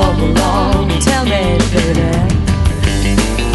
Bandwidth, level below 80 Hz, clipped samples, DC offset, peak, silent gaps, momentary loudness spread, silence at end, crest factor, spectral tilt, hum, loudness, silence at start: 12 kHz; -18 dBFS; under 0.1%; under 0.1%; 0 dBFS; none; 2 LU; 0 s; 12 dB; -5.5 dB/octave; none; -13 LUFS; 0 s